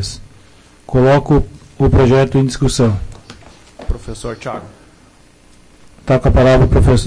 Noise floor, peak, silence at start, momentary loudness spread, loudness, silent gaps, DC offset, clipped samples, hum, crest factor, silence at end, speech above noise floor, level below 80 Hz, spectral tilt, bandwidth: -46 dBFS; -4 dBFS; 0 s; 20 LU; -13 LUFS; none; under 0.1%; under 0.1%; none; 10 dB; 0 s; 34 dB; -24 dBFS; -7 dB/octave; 10.5 kHz